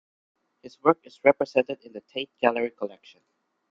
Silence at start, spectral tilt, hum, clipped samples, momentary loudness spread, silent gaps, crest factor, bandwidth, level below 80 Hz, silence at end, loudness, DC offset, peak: 0.65 s; -6 dB/octave; none; under 0.1%; 14 LU; none; 24 dB; 7.2 kHz; -72 dBFS; 0.85 s; -25 LUFS; under 0.1%; -4 dBFS